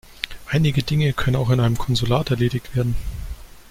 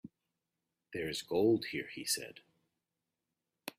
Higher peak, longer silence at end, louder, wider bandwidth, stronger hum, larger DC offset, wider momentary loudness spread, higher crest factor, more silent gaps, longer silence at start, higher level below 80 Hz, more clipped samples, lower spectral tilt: first, -2 dBFS vs -18 dBFS; about the same, 0 s vs 0.1 s; first, -21 LUFS vs -35 LUFS; about the same, 16 kHz vs 15.5 kHz; neither; neither; second, 13 LU vs 17 LU; about the same, 18 dB vs 20 dB; neither; about the same, 0.1 s vs 0.05 s; first, -34 dBFS vs -72 dBFS; neither; first, -6.5 dB/octave vs -3.5 dB/octave